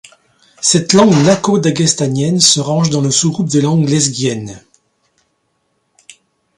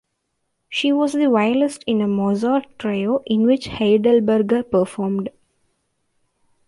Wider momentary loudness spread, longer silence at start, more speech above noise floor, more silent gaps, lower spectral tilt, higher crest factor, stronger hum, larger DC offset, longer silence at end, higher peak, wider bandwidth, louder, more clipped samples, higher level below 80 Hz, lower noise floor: about the same, 7 LU vs 8 LU; about the same, 0.6 s vs 0.7 s; about the same, 52 dB vs 55 dB; neither; second, -4.5 dB/octave vs -6.5 dB/octave; about the same, 14 dB vs 14 dB; neither; neither; first, 2 s vs 1.4 s; first, 0 dBFS vs -6 dBFS; about the same, 11.5 kHz vs 11.5 kHz; first, -12 LUFS vs -19 LUFS; neither; about the same, -52 dBFS vs -56 dBFS; second, -64 dBFS vs -73 dBFS